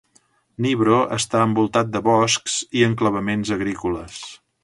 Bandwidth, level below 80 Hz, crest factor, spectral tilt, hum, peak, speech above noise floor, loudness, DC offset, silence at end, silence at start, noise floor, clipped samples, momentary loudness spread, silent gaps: 11.5 kHz; -50 dBFS; 18 dB; -4.5 dB/octave; none; -4 dBFS; 41 dB; -20 LUFS; under 0.1%; 0.3 s; 0.6 s; -60 dBFS; under 0.1%; 10 LU; none